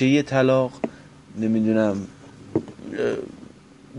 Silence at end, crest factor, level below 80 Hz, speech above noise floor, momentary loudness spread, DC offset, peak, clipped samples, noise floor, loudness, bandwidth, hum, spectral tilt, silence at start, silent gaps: 0 s; 18 dB; -58 dBFS; 26 dB; 20 LU; under 0.1%; -6 dBFS; under 0.1%; -47 dBFS; -23 LUFS; 10 kHz; none; -7 dB/octave; 0 s; none